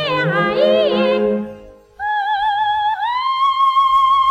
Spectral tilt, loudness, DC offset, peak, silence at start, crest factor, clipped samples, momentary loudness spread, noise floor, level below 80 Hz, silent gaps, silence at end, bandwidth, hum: -6 dB/octave; -16 LUFS; under 0.1%; -4 dBFS; 0 s; 12 dB; under 0.1%; 8 LU; -38 dBFS; -52 dBFS; none; 0 s; 10 kHz; none